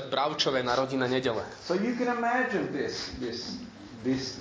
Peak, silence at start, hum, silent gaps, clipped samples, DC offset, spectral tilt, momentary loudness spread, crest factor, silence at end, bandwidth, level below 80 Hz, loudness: -12 dBFS; 0 s; none; none; under 0.1%; under 0.1%; -4.5 dB/octave; 10 LU; 18 dB; 0 s; 8 kHz; -58 dBFS; -29 LUFS